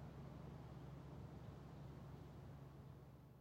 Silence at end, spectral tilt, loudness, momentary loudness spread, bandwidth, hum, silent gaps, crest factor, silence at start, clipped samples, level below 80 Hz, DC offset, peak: 0 s; -8 dB/octave; -58 LUFS; 4 LU; 16 kHz; none; none; 14 dB; 0 s; under 0.1%; -66 dBFS; under 0.1%; -44 dBFS